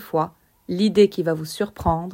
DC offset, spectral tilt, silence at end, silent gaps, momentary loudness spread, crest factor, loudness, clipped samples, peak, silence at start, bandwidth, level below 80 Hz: under 0.1%; -6.5 dB/octave; 0 s; none; 12 LU; 18 dB; -22 LUFS; under 0.1%; -4 dBFS; 0 s; 16.5 kHz; -44 dBFS